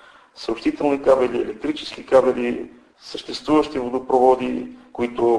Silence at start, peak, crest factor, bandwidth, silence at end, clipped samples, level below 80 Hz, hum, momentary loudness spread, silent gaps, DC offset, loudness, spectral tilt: 0.35 s; -2 dBFS; 18 dB; 10.5 kHz; 0 s; under 0.1%; -52 dBFS; none; 15 LU; none; under 0.1%; -21 LUFS; -5.5 dB/octave